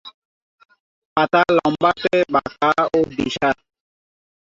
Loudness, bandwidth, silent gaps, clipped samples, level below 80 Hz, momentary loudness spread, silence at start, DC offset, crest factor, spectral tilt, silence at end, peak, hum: -18 LUFS; 7.8 kHz; 0.14-0.58 s, 0.65-0.69 s, 0.80-1.16 s; under 0.1%; -54 dBFS; 6 LU; 0.05 s; under 0.1%; 18 dB; -5.5 dB/octave; 0.95 s; -2 dBFS; none